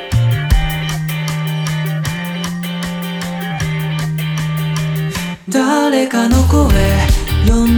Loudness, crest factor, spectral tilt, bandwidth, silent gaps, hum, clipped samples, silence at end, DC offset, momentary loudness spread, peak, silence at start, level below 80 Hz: -16 LUFS; 12 dB; -5.5 dB/octave; over 20 kHz; none; none; under 0.1%; 0 s; under 0.1%; 9 LU; -2 dBFS; 0 s; -22 dBFS